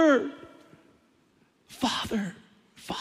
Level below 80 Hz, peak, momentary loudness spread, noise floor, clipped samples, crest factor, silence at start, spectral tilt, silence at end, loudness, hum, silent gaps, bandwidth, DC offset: -62 dBFS; -10 dBFS; 25 LU; -65 dBFS; under 0.1%; 20 dB; 0 s; -4.5 dB/octave; 0 s; -29 LUFS; none; none; 15.5 kHz; under 0.1%